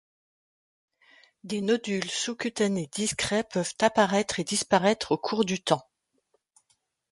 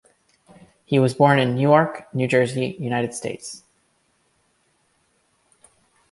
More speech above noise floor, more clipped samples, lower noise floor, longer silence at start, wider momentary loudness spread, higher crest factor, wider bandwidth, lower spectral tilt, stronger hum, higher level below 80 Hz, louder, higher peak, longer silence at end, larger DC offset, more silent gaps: about the same, 46 dB vs 46 dB; neither; first, -73 dBFS vs -66 dBFS; first, 1.45 s vs 0.9 s; second, 6 LU vs 15 LU; about the same, 22 dB vs 22 dB; about the same, 11.5 kHz vs 11.5 kHz; second, -3.5 dB/octave vs -6 dB/octave; neither; about the same, -64 dBFS vs -64 dBFS; second, -27 LUFS vs -20 LUFS; second, -6 dBFS vs -2 dBFS; second, 1.3 s vs 2.55 s; neither; neither